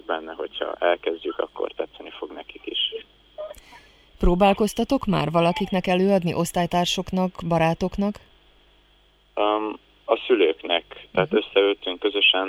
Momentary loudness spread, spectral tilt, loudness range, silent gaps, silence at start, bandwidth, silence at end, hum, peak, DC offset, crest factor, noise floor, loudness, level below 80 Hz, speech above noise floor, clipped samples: 17 LU; -5 dB/octave; 6 LU; none; 0.1 s; 16 kHz; 0 s; 50 Hz at -45 dBFS; -6 dBFS; under 0.1%; 18 dB; -58 dBFS; -23 LUFS; -38 dBFS; 36 dB; under 0.1%